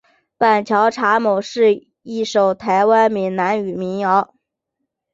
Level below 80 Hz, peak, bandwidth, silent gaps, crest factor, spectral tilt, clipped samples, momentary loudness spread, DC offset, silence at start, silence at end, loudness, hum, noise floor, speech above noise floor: -64 dBFS; -2 dBFS; 7.8 kHz; none; 16 dB; -5.5 dB/octave; under 0.1%; 9 LU; under 0.1%; 0.4 s; 0.9 s; -17 LUFS; none; -77 dBFS; 61 dB